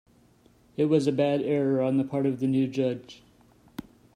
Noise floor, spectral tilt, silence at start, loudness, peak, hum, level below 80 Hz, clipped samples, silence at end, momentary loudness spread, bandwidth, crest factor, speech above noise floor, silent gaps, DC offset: -60 dBFS; -8 dB/octave; 0.8 s; -26 LUFS; -10 dBFS; none; -68 dBFS; under 0.1%; 0.35 s; 20 LU; 10.5 kHz; 16 dB; 35 dB; none; under 0.1%